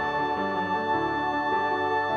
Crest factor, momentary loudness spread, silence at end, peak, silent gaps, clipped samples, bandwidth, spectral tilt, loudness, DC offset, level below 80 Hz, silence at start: 12 dB; 2 LU; 0 s; -14 dBFS; none; under 0.1%; 7.4 kHz; -6 dB/octave; -26 LUFS; under 0.1%; -58 dBFS; 0 s